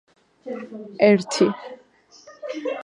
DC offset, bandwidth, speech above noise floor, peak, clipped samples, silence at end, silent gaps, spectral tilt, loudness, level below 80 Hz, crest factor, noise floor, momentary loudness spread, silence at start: under 0.1%; 11 kHz; 29 dB; -2 dBFS; under 0.1%; 0 s; none; -5 dB/octave; -20 LUFS; -74 dBFS; 22 dB; -51 dBFS; 21 LU; 0.45 s